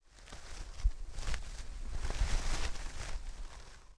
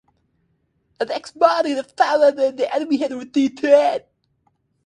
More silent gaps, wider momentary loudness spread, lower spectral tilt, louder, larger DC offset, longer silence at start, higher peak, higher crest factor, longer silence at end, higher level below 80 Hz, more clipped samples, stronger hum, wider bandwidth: neither; first, 14 LU vs 11 LU; about the same, -3.5 dB/octave vs -4 dB/octave; second, -43 LUFS vs -19 LUFS; neither; second, 0.15 s vs 1 s; second, -18 dBFS vs 0 dBFS; about the same, 18 dB vs 20 dB; second, 0.05 s vs 0.85 s; first, -38 dBFS vs -70 dBFS; neither; neither; about the same, 11 kHz vs 10 kHz